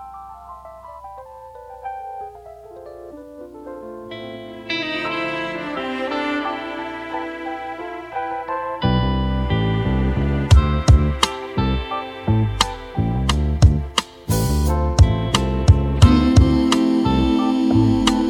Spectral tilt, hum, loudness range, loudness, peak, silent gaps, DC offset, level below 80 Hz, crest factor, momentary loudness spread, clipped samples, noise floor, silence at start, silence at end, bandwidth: -6 dB/octave; none; 18 LU; -19 LUFS; 0 dBFS; none; under 0.1%; -26 dBFS; 18 dB; 22 LU; under 0.1%; -39 dBFS; 0 s; 0 s; 18 kHz